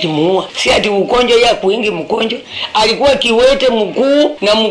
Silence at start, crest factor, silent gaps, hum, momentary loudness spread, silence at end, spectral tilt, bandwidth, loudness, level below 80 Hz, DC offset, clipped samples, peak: 0 s; 12 dB; none; none; 7 LU; 0 s; -4 dB/octave; 11 kHz; -12 LUFS; -38 dBFS; under 0.1%; under 0.1%; 0 dBFS